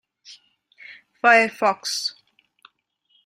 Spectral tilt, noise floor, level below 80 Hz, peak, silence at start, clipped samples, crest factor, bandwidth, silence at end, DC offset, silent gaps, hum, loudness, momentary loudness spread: -1.5 dB/octave; -67 dBFS; -76 dBFS; -2 dBFS; 0.3 s; under 0.1%; 22 dB; 16 kHz; 1.15 s; under 0.1%; none; none; -19 LUFS; 11 LU